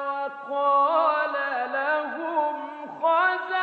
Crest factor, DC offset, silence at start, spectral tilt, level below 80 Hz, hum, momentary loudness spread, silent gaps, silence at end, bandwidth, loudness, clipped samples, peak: 14 dB; under 0.1%; 0 s; -4.5 dB/octave; under -90 dBFS; none; 9 LU; none; 0 s; 5.2 kHz; -24 LUFS; under 0.1%; -10 dBFS